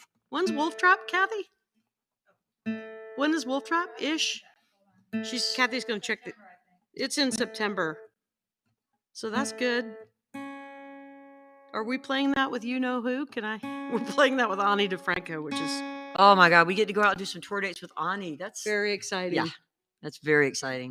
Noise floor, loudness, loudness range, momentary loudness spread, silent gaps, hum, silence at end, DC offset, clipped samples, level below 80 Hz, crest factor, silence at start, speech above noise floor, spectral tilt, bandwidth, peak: -89 dBFS; -27 LUFS; 9 LU; 17 LU; none; none; 0 s; under 0.1%; under 0.1%; -74 dBFS; 24 dB; 0.3 s; 62 dB; -3.5 dB/octave; 15.5 kHz; -4 dBFS